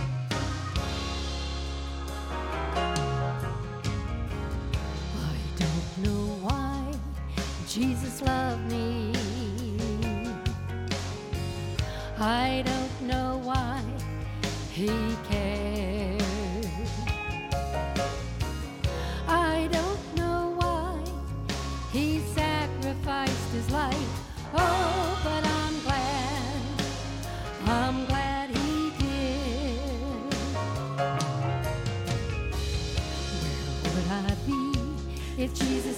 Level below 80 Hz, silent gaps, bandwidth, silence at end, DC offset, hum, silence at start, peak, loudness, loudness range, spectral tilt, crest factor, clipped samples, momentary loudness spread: -36 dBFS; none; 16.5 kHz; 0 s; under 0.1%; none; 0 s; -12 dBFS; -30 LUFS; 3 LU; -5.5 dB/octave; 18 dB; under 0.1%; 6 LU